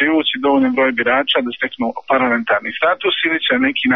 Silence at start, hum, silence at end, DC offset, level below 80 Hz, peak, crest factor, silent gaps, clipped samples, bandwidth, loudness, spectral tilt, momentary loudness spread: 0 s; none; 0 s; 0.2%; -56 dBFS; -2 dBFS; 14 dB; none; under 0.1%; 5.2 kHz; -16 LUFS; -0.5 dB/octave; 5 LU